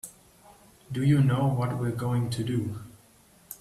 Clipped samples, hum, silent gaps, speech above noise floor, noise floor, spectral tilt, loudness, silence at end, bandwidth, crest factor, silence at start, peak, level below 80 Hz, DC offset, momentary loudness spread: under 0.1%; none; none; 33 dB; -58 dBFS; -7 dB/octave; -27 LUFS; 0.05 s; 14 kHz; 16 dB; 0.05 s; -12 dBFS; -58 dBFS; under 0.1%; 18 LU